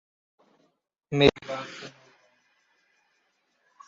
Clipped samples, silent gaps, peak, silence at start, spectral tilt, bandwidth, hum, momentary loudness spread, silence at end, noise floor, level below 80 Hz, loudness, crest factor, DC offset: under 0.1%; none; -4 dBFS; 1.1 s; -4 dB/octave; 7.6 kHz; none; 21 LU; 2 s; -72 dBFS; -54 dBFS; -25 LUFS; 28 dB; under 0.1%